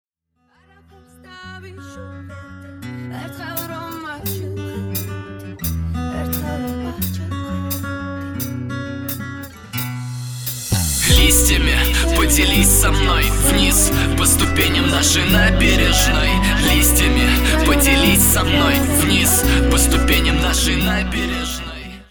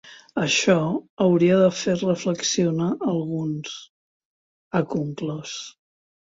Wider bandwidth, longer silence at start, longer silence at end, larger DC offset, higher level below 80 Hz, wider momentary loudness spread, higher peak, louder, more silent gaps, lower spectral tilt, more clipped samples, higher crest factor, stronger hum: first, over 20 kHz vs 8 kHz; first, 1.3 s vs 0.05 s; second, 0.1 s vs 0.6 s; neither; first, -22 dBFS vs -64 dBFS; first, 18 LU vs 14 LU; about the same, -2 dBFS vs -4 dBFS; first, -16 LUFS vs -22 LUFS; second, none vs 1.10-1.17 s, 3.89-4.71 s; second, -3.5 dB/octave vs -5 dB/octave; neither; second, 14 dB vs 20 dB; neither